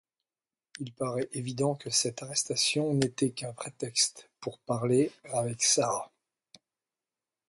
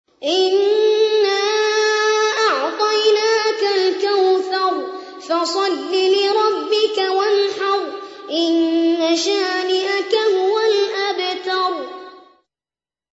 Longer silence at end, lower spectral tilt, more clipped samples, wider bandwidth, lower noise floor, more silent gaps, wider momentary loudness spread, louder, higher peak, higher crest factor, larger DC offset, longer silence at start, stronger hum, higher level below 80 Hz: first, 1.4 s vs 0.95 s; first, -3.5 dB/octave vs -1 dB/octave; neither; first, 11.5 kHz vs 8 kHz; about the same, under -90 dBFS vs under -90 dBFS; neither; first, 14 LU vs 6 LU; second, -29 LUFS vs -17 LUFS; second, -12 dBFS vs -4 dBFS; first, 20 dB vs 14 dB; neither; first, 0.75 s vs 0.2 s; neither; about the same, -70 dBFS vs -74 dBFS